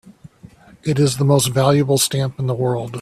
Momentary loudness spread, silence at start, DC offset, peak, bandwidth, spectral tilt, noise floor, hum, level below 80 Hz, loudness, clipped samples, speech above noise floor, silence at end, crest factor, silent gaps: 7 LU; 0.05 s; under 0.1%; 0 dBFS; 14.5 kHz; -5 dB/octave; -45 dBFS; none; -52 dBFS; -17 LUFS; under 0.1%; 28 dB; 0 s; 18 dB; none